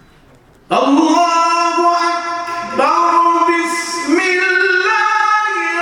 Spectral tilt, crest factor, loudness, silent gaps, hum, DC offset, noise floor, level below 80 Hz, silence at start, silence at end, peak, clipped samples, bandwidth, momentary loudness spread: -2 dB/octave; 14 dB; -13 LUFS; none; none; under 0.1%; -46 dBFS; -58 dBFS; 0.7 s; 0 s; 0 dBFS; under 0.1%; 17 kHz; 7 LU